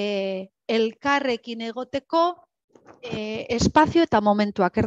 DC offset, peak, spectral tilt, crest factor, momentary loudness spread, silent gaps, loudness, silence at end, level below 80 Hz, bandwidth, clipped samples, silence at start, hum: under 0.1%; -4 dBFS; -5.5 dB/octave; 20 dB; 13 LU; 2.64-2.68 s; -23 LUFS; 0 s; -48 dBFS; 8.4 kHz; under 0.1%; 0 s; none